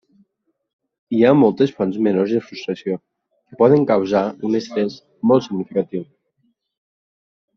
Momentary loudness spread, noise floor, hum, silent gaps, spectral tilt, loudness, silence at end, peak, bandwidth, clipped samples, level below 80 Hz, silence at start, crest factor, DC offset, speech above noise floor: 12 LU; -72 dBFS; none; none; -6.5 dB/octave; -18 LUFS; 1.55 s; -2 dBFS; 6.6 kHz; under 0.1%; -62 dBFS; 1.1 s; 18 dB; under 0.1%; 54 dB